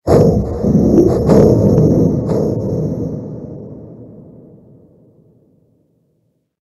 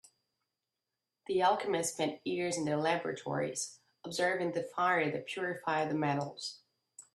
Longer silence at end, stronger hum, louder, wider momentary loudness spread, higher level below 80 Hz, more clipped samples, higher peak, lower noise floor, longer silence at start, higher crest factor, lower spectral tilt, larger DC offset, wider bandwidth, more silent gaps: first, 2.4 s vs 0.15 s; neither; first, -13 LUFS vs -34 LUFS; first, 21 LU vs 11 LU; first, -32 dBFS vs -78 dBFS; neither; first, 0 dBFS vs -16 dBFS; second, -63 dBFS vs -89 dBFS; second, 0.05 s vs 1.3 s; second, 14 dB vs 20 dB; first, -9.5 dB/octave vs -4 dB/octave; neither; about the same, 12.5 kHz vs 13.5 kHz; neither